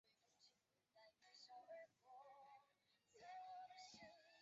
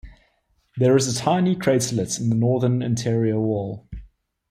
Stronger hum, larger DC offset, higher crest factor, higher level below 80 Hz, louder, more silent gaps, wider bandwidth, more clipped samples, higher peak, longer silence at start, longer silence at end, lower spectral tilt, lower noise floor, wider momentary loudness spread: neither; neither; about the same, 14 dB vs 16 dB; second, under -90 dBFS vs -48 dBFS; second, -63 LUFS vs -21 LUFS; neither; second, 7.6 kHz vs 14 kHz; neither; second, -50 dBFS vs -6 dBFS; about the same, 0.05 s vs 0.05 s; second, 0 s vs 0.45 s; second, 0 dB/octave vs -6 dB/octave; first, -84 dBFS vs -66 dBFS; second, 9 LU vs 16 LU